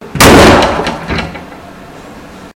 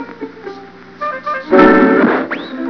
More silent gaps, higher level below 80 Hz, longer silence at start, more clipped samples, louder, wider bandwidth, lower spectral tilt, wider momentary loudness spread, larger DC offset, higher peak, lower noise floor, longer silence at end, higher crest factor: neither; first, -24 dBFS vs -46 dBFS; about the same, 0 s vs 0 s; first, 4% vs 0.2%; first, -7 LUFS vs -12 LUFS; first, over 20 kHz vs 5.4 kHz; second, -4 dB/octave vs -7.5 dB/octave; about the same, 19 LU vs 21 LU; second, under 0.1% vs 0.3%; about the same, 0 dBFS vs 0 dBFS; second, -30 dBFS vs -34 dBFS; about the same, 0.1 s vs 0 s; about the same, 10 dB vs 14 dB